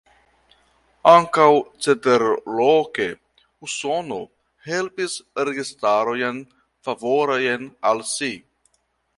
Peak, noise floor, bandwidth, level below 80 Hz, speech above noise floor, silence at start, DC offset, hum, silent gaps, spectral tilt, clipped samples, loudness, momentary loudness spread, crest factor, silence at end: 0 dBFS; -68 dBFS; 11.5 kHz; -64 dBFS; 49 dB; 1.05 s; under 0.1%; none; none; -4 dB/octave; under 0.1%; -20 LUFS; 16 LU; 22 dB; 0.8 s